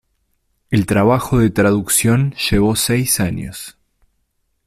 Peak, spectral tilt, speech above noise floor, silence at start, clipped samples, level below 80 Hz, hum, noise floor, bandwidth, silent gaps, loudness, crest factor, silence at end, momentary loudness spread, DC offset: -2 dBFS; -4.5 dB/octave; 52 dB; 0.7 s; under 0.1%; -38 dBFS; none; -67 dBFS; 16 kHz; none; -15 LUFS; 14 dB; 0.95 s; 12 LU; under 0.1%